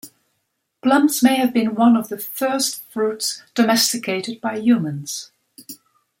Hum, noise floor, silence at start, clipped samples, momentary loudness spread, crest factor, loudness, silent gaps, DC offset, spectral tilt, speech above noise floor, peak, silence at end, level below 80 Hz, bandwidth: none; -73 dBFS; 0.05 s; under 0.1%; 12 LU; 18 dB; -19 LUFS; none; under 0.1%; -3.5 dB/octave; 54 dB; -4 dBFS; 0.45 s; -68 dBFS; 16.5 kHz